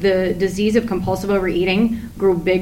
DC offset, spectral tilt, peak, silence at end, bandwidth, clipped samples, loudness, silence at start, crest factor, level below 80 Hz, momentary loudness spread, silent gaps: under 0.1%; -6.5 dB/octave; -2 dBFS; 0 s; 16.5 kHz; under 0.1%; -19 LUFS; 0 s; 14 dB; -38 dBFS; 4 LU; none